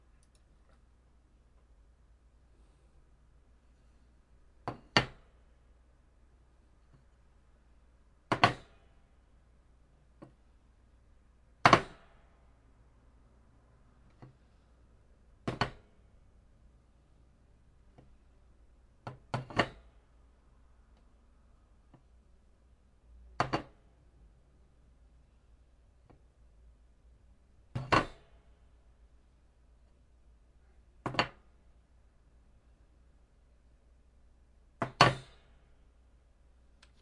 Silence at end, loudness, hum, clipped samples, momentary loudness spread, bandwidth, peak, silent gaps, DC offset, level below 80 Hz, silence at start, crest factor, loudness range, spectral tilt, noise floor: 1.8 s; -32 LUFS; none; under 0.1%; 32 LU; 11 kHz; -4 dBFS; none; under 0.1%; -60 dBFS; 4.65 s; 36 dB; 11 LU; -4.5 dB/octave; -64 dBFS